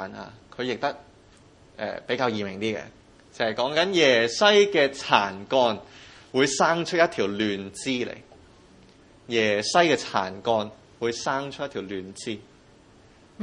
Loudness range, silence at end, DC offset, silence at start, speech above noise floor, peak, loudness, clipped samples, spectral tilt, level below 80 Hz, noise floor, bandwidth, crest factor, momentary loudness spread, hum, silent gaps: 9 LU; 0 s; under 0.1%; 0 s; 30 dB; 0 dBFS; -24 LUFS; under 0.1%; -3.5 dB/octave; -64 dBFS; -54 dBFS; 11 kHz; 26 dB; 16 LU; none; none